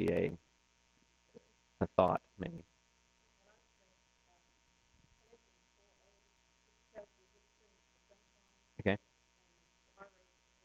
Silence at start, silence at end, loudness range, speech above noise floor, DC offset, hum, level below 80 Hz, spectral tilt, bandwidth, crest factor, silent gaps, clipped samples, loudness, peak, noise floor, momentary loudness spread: 0 s; 0.6 s; 12 LU; 38 dB; under 0.1%; none; -68 dBFS; -7.5 dB/octave; 8.2 kHz; 32 dB; none; under 0.1%; -37 LUFS; -12 dBFS; -73 dBFS; 25 LU